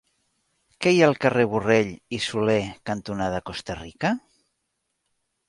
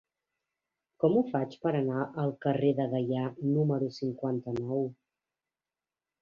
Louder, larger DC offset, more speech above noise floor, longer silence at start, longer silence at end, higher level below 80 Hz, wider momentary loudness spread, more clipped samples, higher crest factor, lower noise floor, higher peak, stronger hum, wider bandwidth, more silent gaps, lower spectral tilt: first, -23 LUFS vs -31 LUFS; neither; second, 54 dB vs over 60 dB; second, 0.8 s vs 1 s; about the same, 1.3 s vs 1.3 s; first, -54 dBFS vs -70 dBFS; first, 13 LU vs 6 LU; neither; about the same, 20 dB vs 18 dB; second, -77 dBFS vs under -90 dBFS; first, -4 dBFS vs -14 dBFS; neither; first, 11.5 kHz vs 7 kHz; neither; second, -5.5 dB/octave vs -9.5 dB/octave